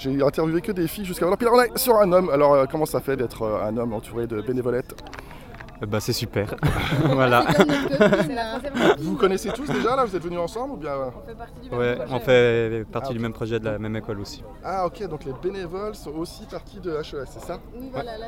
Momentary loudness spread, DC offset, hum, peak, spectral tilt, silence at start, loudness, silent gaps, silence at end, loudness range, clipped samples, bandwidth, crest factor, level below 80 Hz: 17 LU; under 0.1%; none; 0 dBFS; -5.5 dB/octave; 0 s; -23 LUFS; none; 0 s; 10 LU; under 0.1%; 17 kHz; 22 dB; -42 dBFS